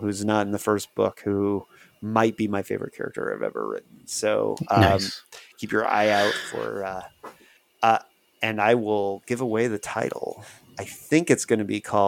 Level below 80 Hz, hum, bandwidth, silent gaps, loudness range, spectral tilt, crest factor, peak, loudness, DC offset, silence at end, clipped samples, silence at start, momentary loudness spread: -60 dBFS; none; 18 kHz; none; 3 LU; -5 dB/octave; 22 dB; -4 dBFS; -24 LUFS; under 0.1%; 0 s; under 0.1%; 0 s; 15 LU